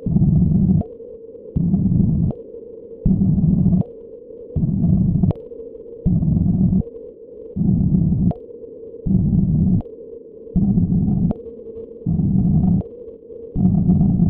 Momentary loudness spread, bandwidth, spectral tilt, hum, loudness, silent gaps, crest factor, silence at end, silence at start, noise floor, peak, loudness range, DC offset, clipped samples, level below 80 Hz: 20 LU; 1.3 kHz; -16 dB/octave; none; -19 LUFS; none; 14 dB; 0 s; 0 s; -37 dBFS; -4 dBFS; 1 LU; under 0.1%; under 0.1%; -30 dBFS